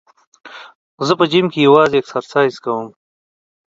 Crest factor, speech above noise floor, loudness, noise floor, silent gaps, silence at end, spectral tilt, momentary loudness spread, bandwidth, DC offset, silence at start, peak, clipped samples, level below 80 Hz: 16 dB; over 76 dB; -15 LUFS; under -90 dBFS; 0.75-0.98 s; 0.8 s; -6 dB/octave; 20 LU; 7.8 kHz; under 0.1%; 0.45 s; 0 dBFS; under 0.1%; -62 dBFS